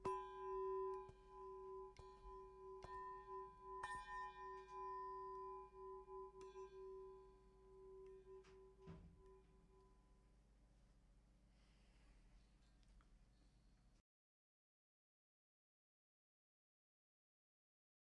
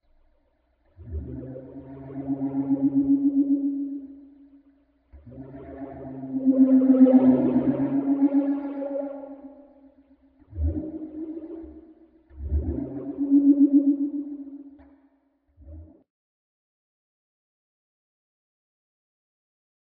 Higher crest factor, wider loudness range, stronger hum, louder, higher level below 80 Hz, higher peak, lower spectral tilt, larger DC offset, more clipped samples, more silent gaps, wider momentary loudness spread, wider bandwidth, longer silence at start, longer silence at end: about the same, 22 dB vs 20 dB; about the same, 13 LU vs 14 LU; first, 50 Hz at -75 dBFS vs none; second, -55 LUFS vs -23 LUFS; second, -72 dBFS vs -42 dBFS; second, -36 dBFS vs -6 dBFS; second, -6 dB/octave vs -13 dB/octave; neither; neither; neither; second, 15 LU vs 23 LU; first, 10 kHz vs 2.5 kHz; second, 0 s vs 1 s; about the same, 4.1 s vs 4.05 s